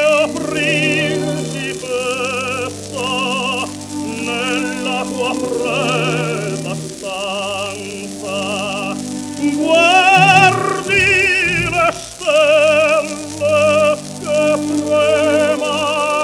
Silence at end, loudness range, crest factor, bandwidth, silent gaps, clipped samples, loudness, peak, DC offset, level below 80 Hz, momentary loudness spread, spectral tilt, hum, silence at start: 0 s; 8 LU; 16 dB; 14 kHz; none; under 0.1%; -15 LUFS; 0 dBFS; under 0.1%; -48 dBFS; 12 LU; -3.5 dB/octave; none; 0 s